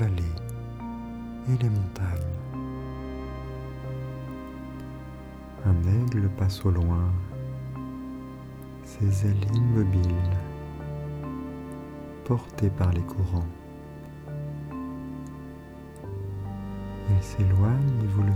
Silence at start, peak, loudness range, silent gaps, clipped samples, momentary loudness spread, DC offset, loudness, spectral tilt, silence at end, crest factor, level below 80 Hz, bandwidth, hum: 0 s; -12 dBFS; 8 LU; none; under 0.1%; 17 LU; under 0.1%; -29 LUFS; -8.5 dB/octave; 0 s; 16 dB; -42 dBFS; 12 kHz; none